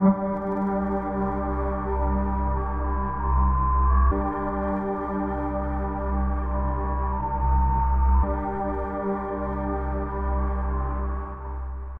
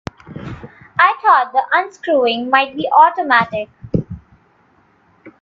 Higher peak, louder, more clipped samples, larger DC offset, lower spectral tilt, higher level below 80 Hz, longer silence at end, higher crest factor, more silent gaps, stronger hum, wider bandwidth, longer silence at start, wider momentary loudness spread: second, -8 dBFS vs 0 dBFS; second, -26 LUFS vs -15 LUFS; neither; first, 0.5% vs under 0.1%; first, -12 dB/octave vs -6 dB/octave; first, -26 dBFS vs -48 dBFS; about the same, 0 s vs 0.1 s; about the same, 16 dB vs 16 dB; neither; neither; second, 2.6 kHz vs 7.4 kHz; second, 0 s vs 0.25 s; second, 6 LU vs 21 LU